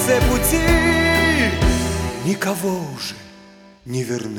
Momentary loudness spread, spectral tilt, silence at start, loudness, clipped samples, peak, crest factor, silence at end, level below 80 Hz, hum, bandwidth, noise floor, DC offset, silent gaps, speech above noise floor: 13 LU; -4.5 dB/octave; 0 s; -18 LUFS; under 0.1%; -4 dBFS; 16 dB; 0 s; -28 dBFS; none; 19.5 kHz; -45 dBFS; under 0.1%; none; 22 dB